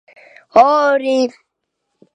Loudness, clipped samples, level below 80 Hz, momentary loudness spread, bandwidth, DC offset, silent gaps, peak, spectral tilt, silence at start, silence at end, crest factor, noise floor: -14 LUFS; under 0.1%; -64 dBFS; 7 LU; 9.6 kHz; under 0.1%; none; 0 dBFS; -4 dB/octave; 0.55 s; 0.85 s; 16 dB; -74 dBFS